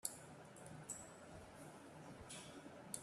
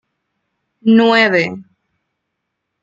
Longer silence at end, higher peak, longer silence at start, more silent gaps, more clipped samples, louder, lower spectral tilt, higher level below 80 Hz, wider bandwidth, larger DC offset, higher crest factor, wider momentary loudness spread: second, 0 s vs 1.2 s; second, -24 dBFS vs 0 dBFS; second, 0.05 s vs 0.85 s; neither; neither; second, -55 LUFS vs -13 LUFS; second, -3 dB/octave vs -6 dB/octave; second, -76 dBFS vs -64 dBFS; first, 14 kHz vs 7.6 kHz; neither; first, 32 dB vs 16 dB; second, 7 LU vs 12 LU